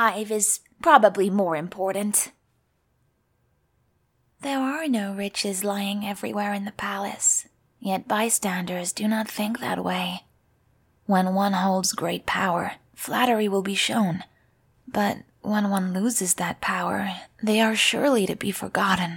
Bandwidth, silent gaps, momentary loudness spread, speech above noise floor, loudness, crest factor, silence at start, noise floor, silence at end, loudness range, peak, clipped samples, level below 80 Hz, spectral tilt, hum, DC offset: 18.5 kHz; none; 9 LU; 45 dB; -24 LUFS; 24 dB; 0 s; -69 dBFS; 0 s; 6 LU; -2 dBFS; under 0.1%; -64 dBFS; -3.5 dB/octave; none; under 0.1%